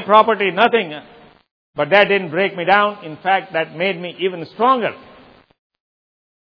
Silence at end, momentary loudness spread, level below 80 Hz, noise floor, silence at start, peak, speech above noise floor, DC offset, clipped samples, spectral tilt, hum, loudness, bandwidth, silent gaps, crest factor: 1.6 s; 12 LU; -66 dBFS; -46 dBFS; 0 s; 0 dBFS; 30 dB; under 0.1%; under 0.1%; -7 dB/octave; none; -17 LUFS; 5.4 kHz; 1.51-1.73 s; 18 dB